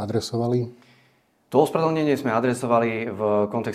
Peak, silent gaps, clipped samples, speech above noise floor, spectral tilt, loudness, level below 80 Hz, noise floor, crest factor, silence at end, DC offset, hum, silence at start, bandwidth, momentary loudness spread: -4 dBFS; none; under 0.1%; 40 dB; -6.5 dB/octave; -23 LUFS; -64 dBFS; -62 dBFS; 20 dB; 0 s; under 0.1%; none; 0 s; 15.5 kHz; 5 LU